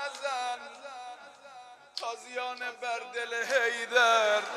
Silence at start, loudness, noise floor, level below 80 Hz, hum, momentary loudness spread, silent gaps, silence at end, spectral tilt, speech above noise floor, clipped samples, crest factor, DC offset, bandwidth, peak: 0 s; -29 LUFS; -51 dBFS; under -90 dBFS; none; 25 LU; none; 0 s; 0.5 dB/octave; 22 dB; under 0.1%; 22 dB; under 0.1%; 13.5 kHz; -10 dBFS